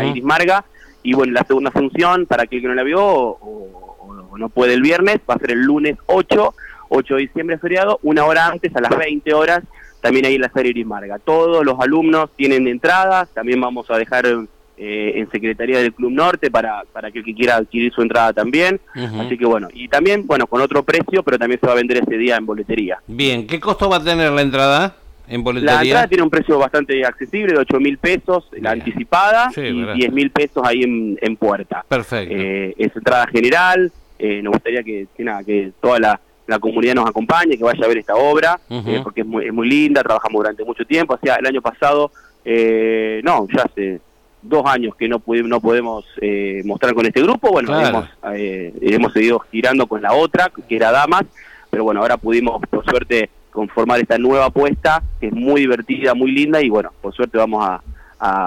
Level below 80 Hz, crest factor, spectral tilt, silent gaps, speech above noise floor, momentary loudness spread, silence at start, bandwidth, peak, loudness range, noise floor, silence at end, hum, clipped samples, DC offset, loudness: -42 dBFS; 10 dB; -5.5 dB/octave; none; 21 dB; 9 LU; 0 s; 16 kHz; -4 dBFS; 2 LU; -37 dBFS; 0 s; none; under 0.1%; under 0.1%; -16 LUFS